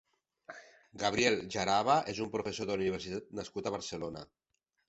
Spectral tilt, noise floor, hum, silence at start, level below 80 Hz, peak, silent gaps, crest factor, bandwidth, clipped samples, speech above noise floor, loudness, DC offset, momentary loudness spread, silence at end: -4 dB/octave; -55 dBFS; none; 0.5 s; -64 dBFS; -14 dBFS; none; 22 dB; 8.2 kHz; under 0.1%; 21 dB; -33 LUFS; under 0.1%; 20 LU; 0.65 s